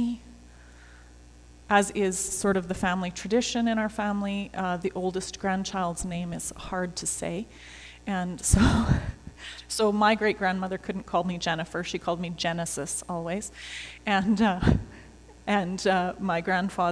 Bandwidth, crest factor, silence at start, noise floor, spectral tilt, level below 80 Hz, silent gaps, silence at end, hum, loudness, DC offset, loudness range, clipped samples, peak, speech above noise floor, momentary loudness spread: 11 kHz; 22 dB; 0 s; -50 dBFS; -4.5 dB/octave; -40 dBFS; none; 0 s; none; -27 LUFS; under 0.1%; 5 LU; under 0.1%; -6 dBFS; 23 dB; 12 LU